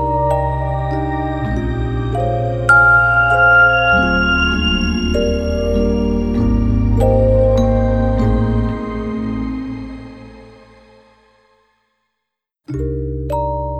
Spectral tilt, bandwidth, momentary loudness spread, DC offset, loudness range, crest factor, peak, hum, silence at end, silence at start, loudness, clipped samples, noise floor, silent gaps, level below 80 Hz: -7 dB/octave; 9 kHz; 13 LU; under 0.1%; 17 LU; 16 dB; 0 dBFS; none; 0 s; 0 s; -15 LUFS; under 0.1%; -78 dBFS; none; -24 dBFS